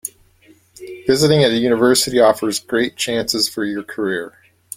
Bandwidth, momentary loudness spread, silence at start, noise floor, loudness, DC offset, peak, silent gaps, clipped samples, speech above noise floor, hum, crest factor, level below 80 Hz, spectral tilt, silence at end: 16.5 kHz; 12 LU; 0.05 s; -52 dBFS; -17 LUFS; under 0.1%; -2 dBFS; none; under 0.1%; 35 dB; none; 16 dB; -52 dBFS; -4 dB/octave; 0.5 s